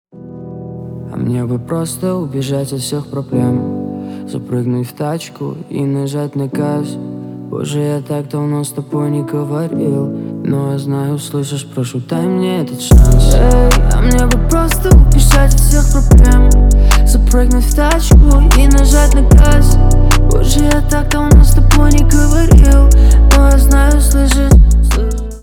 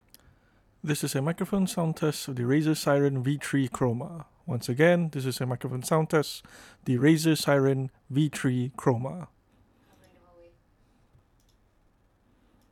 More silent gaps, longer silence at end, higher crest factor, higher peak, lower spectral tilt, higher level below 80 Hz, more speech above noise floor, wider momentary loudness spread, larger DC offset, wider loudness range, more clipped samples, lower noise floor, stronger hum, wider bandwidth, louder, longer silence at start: neither; second, 0 s vs 3.45 s; second, 8 dB vs 20 dB; first, 0 dBFS vs -8 dBFS; about the same, -6 dB/octave vs -6 dB/octave; first, -10 dBFS vs -62 dBFS; second, 21 dB vs 39 dB; about the same, 13 LU vs 13 LU; neither; first, 10 LU vs 6 LU; first, 2% vs under 0.1%; second, -29 dBFS vs -65 dBFS; neither; about the same, 17 kHz vs 18.5 kHz; first, -12 LUFS vs -27 LUFS; second, 0.2 s vs 0.85 s